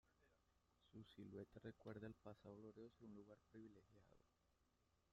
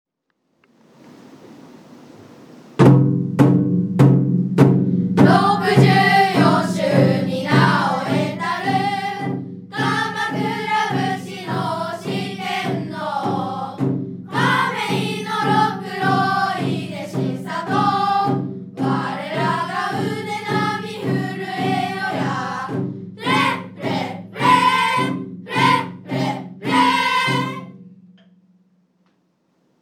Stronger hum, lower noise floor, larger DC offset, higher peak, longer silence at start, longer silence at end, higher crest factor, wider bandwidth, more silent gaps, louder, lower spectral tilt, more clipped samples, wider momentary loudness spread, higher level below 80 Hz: neither; first, -84 dBFS vs -70 dBFS; neither; second, -42 dBFS vs 0 dBFS; second, 0.05 s vs 1.05 s; second, 0.1 s vs 1.9 s; about the same, 20 dB vs 20 dB; second, 7.4 kHz vs 14.5 kHz; neither; second, -62 LUFS vs -19 LUFS; about the same, -6.5 dB/octave vs -6.5 dB/octave; neither; second, 8 LU vs 11 LU; second, -84 dBFS vs -62 dBFS